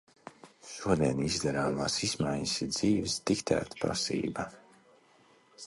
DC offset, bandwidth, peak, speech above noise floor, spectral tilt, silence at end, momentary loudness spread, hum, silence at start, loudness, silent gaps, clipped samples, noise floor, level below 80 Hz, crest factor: under 0.1%; 11.5 kHz; -12 dBFS; 32 dB; -4 dB/octave; 0 s; 13 LU; none; 0.25 s; -31 LUFS; none; under 0.1%; -63 dBFS; -56 dBFS; 20 dB